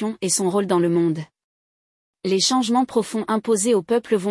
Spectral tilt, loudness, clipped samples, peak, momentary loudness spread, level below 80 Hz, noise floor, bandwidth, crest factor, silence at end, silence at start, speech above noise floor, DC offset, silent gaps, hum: -4 dB/octave; -20 LUFS; under 0.1%; -6 dBFS; 6 LU; -68 dBFS; under -90 dBFS; 12 kHz; 14 dB; 0 s; 0 s; over 70 dB; under 0.1%; 1.44-2.13 s; none